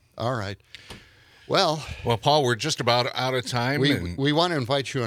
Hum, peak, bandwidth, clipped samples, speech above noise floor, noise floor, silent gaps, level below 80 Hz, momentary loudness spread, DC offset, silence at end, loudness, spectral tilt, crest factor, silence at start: none; -4 dBFS; 15.5 kHz; under 0.1%; 28 dB; -52 dBFS; none; -54 dBFS; 13 LU; under 0.1%; 0 s; -24 LUFS; -4.5 dB/octave; 20 dB; 0.15 s